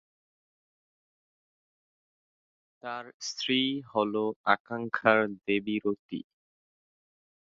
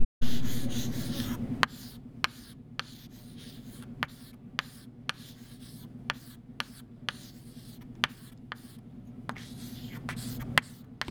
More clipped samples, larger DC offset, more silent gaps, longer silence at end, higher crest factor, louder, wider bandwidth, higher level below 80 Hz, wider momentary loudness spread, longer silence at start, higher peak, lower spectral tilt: neither; neither; first, 3.14-3.20 s, 4.36-4.44 s, 4.60-4.65 s, 5.99-6.09 s vs 0.05-0.21 s; first, 1.35 s vs 0 s; about the same, 28 dB vs 32 dB; first, -29 LUFS vs -36 LUFS; second, 7.8 kHz vs over 20 kHz; second, -76 dBFS vs -46 dBFS; second, 15 LU vs 18 LU; first, 2.85 s vs 0 s; second, -6 dBFS vs 0 dBFS; about the same, -4 dB/octave vs -4 dB/octave